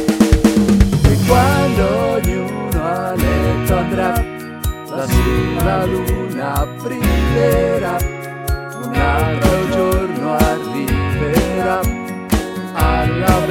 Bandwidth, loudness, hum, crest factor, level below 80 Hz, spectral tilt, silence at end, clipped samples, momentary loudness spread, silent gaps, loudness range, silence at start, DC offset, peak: 18 kHz; -16 LUFS; none; 16 dB; -22 dBFS; -6 dB/octave; 0 s; under 0.1%; 10 LU; none; 3 LU; 0 s; under 0.1%; 0 dBFS